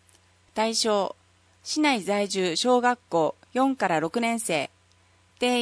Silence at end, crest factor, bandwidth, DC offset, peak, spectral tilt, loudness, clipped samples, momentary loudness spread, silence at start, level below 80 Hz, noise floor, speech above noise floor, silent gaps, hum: 0 s; 18 dB; 11 kHz; under 0.1%; -8 dBFS; -3 dB/octave; -25 LUFS; under 0.1%; 8 LU; 0.55 s; -72 dBFS; -61 dBFS; 36 dB; none; none